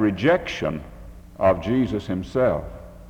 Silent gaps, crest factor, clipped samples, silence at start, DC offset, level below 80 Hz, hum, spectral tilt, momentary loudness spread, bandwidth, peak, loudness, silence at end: none; 18 dB; under 0.1%; 0 s; under 0.1%; -42 dBFS; none; -7 dB/octave; 17 LU; 16 kHz; -6 dBFS; -23 LUFS; 0 s